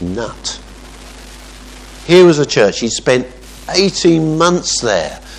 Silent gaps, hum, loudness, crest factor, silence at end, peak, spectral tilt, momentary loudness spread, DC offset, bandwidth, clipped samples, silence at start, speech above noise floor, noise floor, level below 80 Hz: none; none; -13 LUFS; 14 dB; 0 s; 0 dBFS; -4.5 dB/octave; 26 LU; under 0.1%; 12 kHz; 0.1%; 0 s; 22 dB; -34 dBFS; -38 dBFS